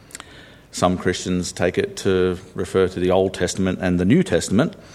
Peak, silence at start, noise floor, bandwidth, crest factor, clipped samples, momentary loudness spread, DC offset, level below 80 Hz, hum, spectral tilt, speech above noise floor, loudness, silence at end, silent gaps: -2 dBFS; 0.15 s; -44 dBFS; 13.5 kHz; 18 dB; under 0.1%; 9 LU; under 0.1%; -48 dBFS; none; -5.5 dB/octave; 25 dB; -20 LUFS; 0 s; none